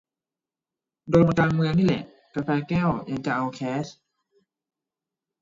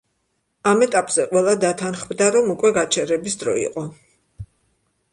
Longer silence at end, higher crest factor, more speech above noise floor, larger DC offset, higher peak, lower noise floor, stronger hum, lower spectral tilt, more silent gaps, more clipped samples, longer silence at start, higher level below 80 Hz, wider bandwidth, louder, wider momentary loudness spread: first, 1.5 s vs 0.7 s; about the same, 20 dB vs 18 dB; first, over 67 dB vs 52 dB; neither; second, -6 dBFS vs -2 dBFS; first, under -90 dBFS vs -71 dBFS; neither; first, -7.5 dB/octave vs -3.5 dB/octave; neither; neither; first, 1.05 s vs 0.65 s; about the same, -52 dBFS vs -56 dBFS; second, 7.6 kHz vs 11.5 kHz; second, -24 LUFS vs -19 LUFS; first, 12 LU vs 9 LU